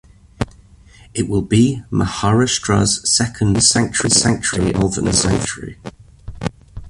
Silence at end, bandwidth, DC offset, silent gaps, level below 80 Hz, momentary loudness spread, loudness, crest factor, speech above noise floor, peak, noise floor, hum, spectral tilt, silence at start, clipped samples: 0 s; 11.5 kHz; under 0.1%; none; -36 dBFS; 15 LU; -16 LUFS; 18 dB; 28 dB; 0 dBFS; -45 dBFS; none; -4 dB/octave; 0.4 s; under 0.1%